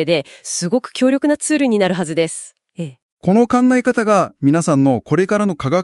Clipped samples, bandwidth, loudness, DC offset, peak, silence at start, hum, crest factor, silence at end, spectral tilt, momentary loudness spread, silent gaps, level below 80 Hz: under 0.1%; 12 kHz; -16 LUFS; under 0.1%; -2 dBFS; 0 s; none; 14 dB; 0 s; -5.5 dB/octave; 14 LU; 3.02-3.17 s; -56 dBFS